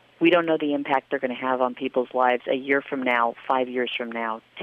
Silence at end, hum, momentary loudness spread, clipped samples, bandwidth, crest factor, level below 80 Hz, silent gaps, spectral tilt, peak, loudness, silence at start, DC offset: 0 s; none; 7 LU; under 0.1%; 5.2 kHz; 18 dB; -74 dBFS; none; -7 dB/octave; -6 dBFS; -24 LUFS; 0.2 s; under 0.1%